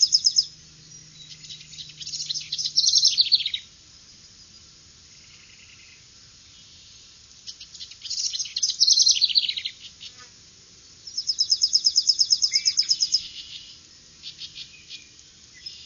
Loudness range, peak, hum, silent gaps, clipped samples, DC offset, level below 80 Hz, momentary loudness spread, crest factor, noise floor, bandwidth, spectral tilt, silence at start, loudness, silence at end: 7 LU; -6 dBFS; none; none; under 0.1%; under 0.1%; -64 dBFS; 24 LU; 22 dB; -50 dBFS; 7.4 kHz; 3 dB/octave; 0 s; -20 LUFS; 0 s